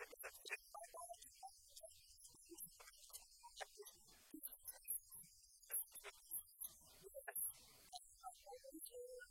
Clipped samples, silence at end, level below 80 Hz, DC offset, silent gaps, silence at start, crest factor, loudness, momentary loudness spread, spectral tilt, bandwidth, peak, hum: under 0.1%; 0 s; -80 dBFS; under 0.1%; none; 0 s; 22 dB; -53 LUFS; 15 LU; 0 dB/octave; 16.5 kHz; -34 dBFS; none